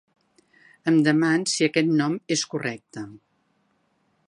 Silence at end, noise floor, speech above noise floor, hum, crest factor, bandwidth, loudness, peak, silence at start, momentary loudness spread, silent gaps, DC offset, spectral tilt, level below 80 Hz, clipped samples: 1.1 s; -68 dBFS; 46 dB; none; 20 dB; 11.5 kHz; -22 LUFS; -4 dBFS; 0.85 s; 18 LU; none; under 0.1%; -4.5 dB/octave; -74 dBFS; under 0.1%